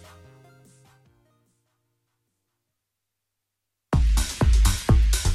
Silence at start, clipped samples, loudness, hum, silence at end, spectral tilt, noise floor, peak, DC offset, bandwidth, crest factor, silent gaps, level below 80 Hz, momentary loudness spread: 3.9 s; under 0.1%; -22 LUFS; none; 0 s; -5 dB/octave; -83 dBFS; -6 dBFS; under 0.1%; 14 kHz; 18 dB; none; -26 dBFS; 4 LU